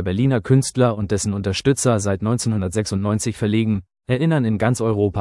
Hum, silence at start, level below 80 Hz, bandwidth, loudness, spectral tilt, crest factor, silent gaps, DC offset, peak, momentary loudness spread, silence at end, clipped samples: none; 0 s; -48 dBFS; 12 kHz; -20 LUFS; -6 dB/octave; 16 dB; none; under 0.1%; -4 dBFS; 4 LU; 0 s; under 0.1%